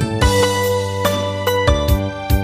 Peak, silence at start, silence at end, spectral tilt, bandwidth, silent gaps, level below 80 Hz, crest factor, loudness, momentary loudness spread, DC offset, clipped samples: -2 dBFS; 0 s; 0 s; -5 dB/octave; 15.5 kHz; none; -24 dBFS; 14 dB; -17 LUFS; 4 LU; under 0.1%; under 0.1%